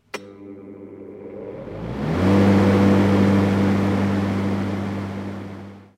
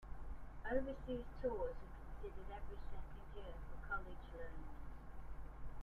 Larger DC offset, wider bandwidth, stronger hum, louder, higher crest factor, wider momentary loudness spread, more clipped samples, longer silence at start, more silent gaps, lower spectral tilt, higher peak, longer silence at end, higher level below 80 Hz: neither; first, 11 kHz vs 4.7 kHz; neither; first, -19 LUFS vs -50 LUFS; about the same, 16 dB vs 20 dB; first, 23 LU vs 13 LU; neither; first, 0.15 s vs 0 s; neither; about the same, -8 dB/octave vs -8 dB/octave; first, -6 dBFS vs -26 dBFS; first, 0.15 s vs 0 s; about the same, -48 dBFS vs -52 dBFS